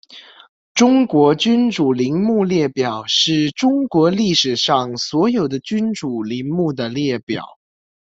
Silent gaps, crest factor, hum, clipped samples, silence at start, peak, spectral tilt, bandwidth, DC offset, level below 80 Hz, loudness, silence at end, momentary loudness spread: 0.49-0.75 s, 7.23-7.27 s; 16 dB; none; under 0.1%; 0.1 s; -2 dBFS; -5 dB/octave; 7.8 kHz; under 0.1%; -58 dBFS; -17 LUFS; 0.65 s; 8 LU